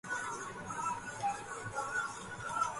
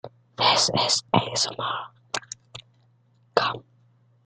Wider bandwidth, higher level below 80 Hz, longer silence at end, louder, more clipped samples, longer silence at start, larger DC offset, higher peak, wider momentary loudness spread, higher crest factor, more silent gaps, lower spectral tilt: about the same, 11.5 kHz vs 12 kHz; about the same, -66 dBFS vs -64 dBFS; second, 0 s vs 0.65 s; second, -39 LUFS vs -23 LUFS; neither; about the same, 0.05 s vs 0.05 s; neither; second, -22 dBFS vs -2 dBFS; second, 5 LU vs 20 LU; second, 18 dB vs 26 dB; neither; about the same, -2.5 dB/octave vs -2.5 dB/octave